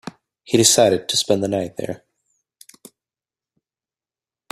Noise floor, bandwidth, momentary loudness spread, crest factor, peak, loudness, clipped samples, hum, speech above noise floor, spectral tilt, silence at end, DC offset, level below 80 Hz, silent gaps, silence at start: under -90 dBFS; 15.5 kHz; 19 LU; 22 dB; 0 dBFS; -17 LUFS; under 0.1%; none; over 72 dB; -3 dB/octave; 2.55 s; under 0.1%; -60 dBFS; none; 0.05 s